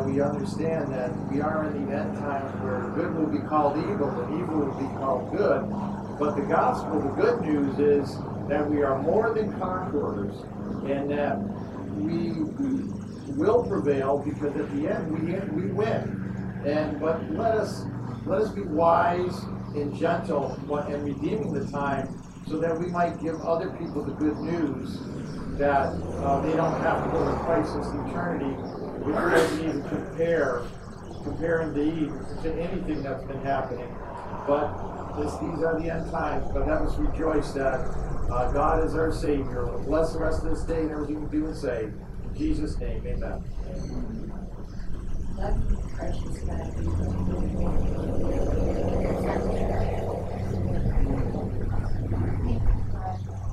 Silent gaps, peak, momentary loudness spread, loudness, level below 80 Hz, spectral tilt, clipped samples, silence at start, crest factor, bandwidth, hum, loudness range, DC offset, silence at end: none; -8 dBFS; 10 LU; -28 LUFS; -34 dBFS; -8 dB/octave; under 0.1%; 0 s; 18 dB; 12.5 kHz; none; 5 LU; under 0.1%; 0 s